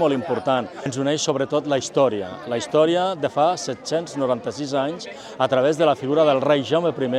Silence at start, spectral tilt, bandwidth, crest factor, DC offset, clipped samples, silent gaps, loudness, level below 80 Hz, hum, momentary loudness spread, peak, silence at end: 0 s; -5 dB/octave; 11.5 kHz; 16 dB; under 0.1%; under 0.1%; none; -21 LUFS; -66 dBFS; none; 9 LU; -4 dBFS; 0 s